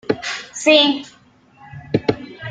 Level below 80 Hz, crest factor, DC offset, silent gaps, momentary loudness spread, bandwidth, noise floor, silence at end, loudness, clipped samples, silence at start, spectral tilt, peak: -54 dBFS; 18 dB; under 0.1%; none; 14 LU; 9.4 kHz; -48 dBFS; 0 s; -17 LUFS; under 0.1%; 0.1 s; -4 dB/octave; -2 dBFS